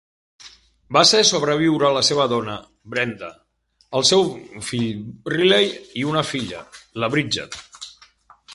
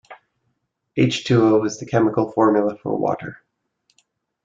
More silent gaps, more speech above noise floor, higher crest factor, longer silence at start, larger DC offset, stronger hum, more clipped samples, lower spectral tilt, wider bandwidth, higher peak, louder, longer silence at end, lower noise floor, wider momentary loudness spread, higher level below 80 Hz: neither; second, 32 dB vs 54 dB; about the same, 22 dB vs 18 dB; first, 0.45 s vs 0.1 s; neither; neither; neither; second, -3 dB/octave vs -6.5 dB/octave; first, 11.5 kHz vs 7.6 kHz; first, 0 dBFS vs -4 dBFS; about the same, -19 LUFS vs -19 LUFS; second, 0 s vs 1.1 s; second, -52 dBFS vs -72 dBFS; first, 20 LU vs 10 LU; about the same, -58 dBFS vs -58 dBFS